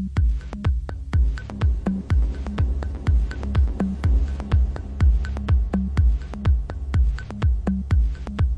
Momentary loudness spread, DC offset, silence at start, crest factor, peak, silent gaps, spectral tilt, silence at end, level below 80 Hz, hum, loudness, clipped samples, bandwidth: 4 LU; under 0.1%; 0 s; 12 dB; -8 dBFS; none; -8.5 dB/octave; 0 s; -22 dBFS; none; -24 LUFS; under 0.1%; 7.4 kHz